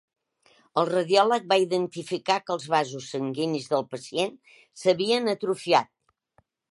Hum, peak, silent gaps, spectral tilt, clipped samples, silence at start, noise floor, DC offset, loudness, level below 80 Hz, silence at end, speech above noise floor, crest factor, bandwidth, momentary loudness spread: none; -6 dBFS; none; -4.5 dB/octave; under 0.1%; 0.75 s; -67 dBFS; under 0.1%; -25 LUFS; -78 dBFS; 0.9 s; 42 dB; 20 dB; 11.5 kHz; 10 LU